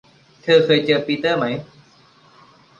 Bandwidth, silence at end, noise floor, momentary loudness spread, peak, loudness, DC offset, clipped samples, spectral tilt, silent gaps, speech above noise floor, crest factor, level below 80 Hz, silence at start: 7.4 kHz; 1.15 s; -52 dBFS; 14 LU; -2 dBFS; -17 LUFS; under 0.1%; under 0.1%; -6 dB/octave; none; 35 dB; 18 dB; -62 dBFS; 0.45 s